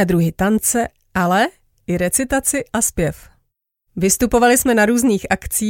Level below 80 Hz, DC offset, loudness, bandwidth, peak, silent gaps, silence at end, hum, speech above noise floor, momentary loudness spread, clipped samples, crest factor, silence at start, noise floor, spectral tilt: -38 dBFS; under 0.1%; -17 LUFS; 17 kHz; -2 dBFS; none; 0 s; none; 54 dB; 9 LU; under 0.1%; 16 dB; 0 s; -70 dBFS; -4 dB/octave